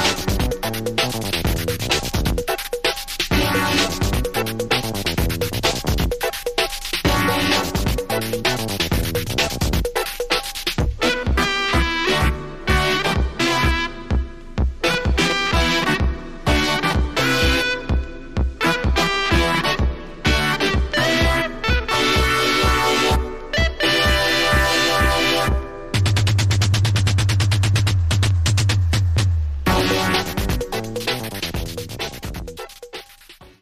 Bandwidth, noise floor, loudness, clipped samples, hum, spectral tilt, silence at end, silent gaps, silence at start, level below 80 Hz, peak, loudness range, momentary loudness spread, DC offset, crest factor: 15.5 kHz; -45 dBFS; -19 LUFS; under 0.1%; none; -4 dB/octave; 0.15 s; none; 0 s; -28 dBFS; -4 dBFS; 4 LU; 8 LU; under 0.1%; 14 dB